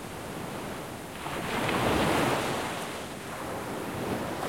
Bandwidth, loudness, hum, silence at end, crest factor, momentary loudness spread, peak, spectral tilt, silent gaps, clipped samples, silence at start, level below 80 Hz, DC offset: 16.5 kHz; -31 LUFS; none; 0 s; 18 dB; 12 LU; -12 dBFS; -4.5 dB/octave; none; under 0.1%; 0 s; -52 dBFS; 0.1%